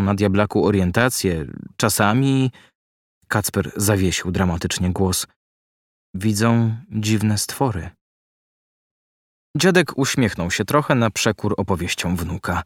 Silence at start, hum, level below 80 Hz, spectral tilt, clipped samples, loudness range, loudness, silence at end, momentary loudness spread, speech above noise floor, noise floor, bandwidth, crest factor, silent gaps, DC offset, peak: 0 s; none; -44 dBFS; -5 dB/octave; under 0.1%; 3 LU; -20 LUFS; 0 s; 8 LU; over 71 dB; under -90 dBFS; 17 kHz; 20 dB; 2.75-3.21 s, 5.36-6.13 s, 8.01-9.54 s; under 0.1%; -2 dBFS